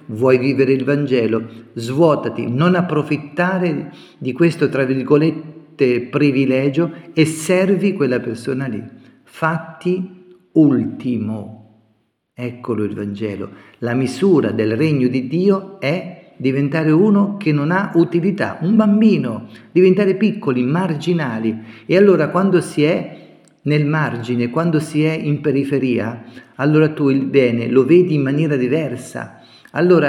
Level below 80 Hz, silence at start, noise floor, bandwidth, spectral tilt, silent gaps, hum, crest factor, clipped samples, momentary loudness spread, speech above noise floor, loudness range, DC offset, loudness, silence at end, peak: -64 dBFS; 0.1 s; -63 dBFS; 13.5 kHz; -7.5 dB/octave; none; none; 16 dB; under 0.1%; 13 LU; 47 dB; 5 LU; under 0.1%; -17 LUFS; 0 s; 0 dBFS